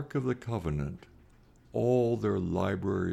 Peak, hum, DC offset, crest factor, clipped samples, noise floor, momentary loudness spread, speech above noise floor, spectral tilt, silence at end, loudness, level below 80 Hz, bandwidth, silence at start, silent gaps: -16 dBFS; none; under 0.1%; 16 dB; under 0.1%; -59 dBFS; 10 LU; 29 dB; -8.5 dB/octave; 0 s; -31 LUFS; -50 dBFS; 12.5 kHz; 0 s; none